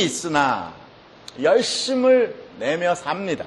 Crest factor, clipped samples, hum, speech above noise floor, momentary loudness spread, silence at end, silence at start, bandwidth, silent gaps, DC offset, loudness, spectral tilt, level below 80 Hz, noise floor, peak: 16 dB; under 0.1%; none; 24 dB; 11 LU; 0 s; 0 s; 12 kHz; none; under 0.1%; -21 LUFS; -3.5 dB/octave; -60 dBFS; -44 dBFS; -4 dBFS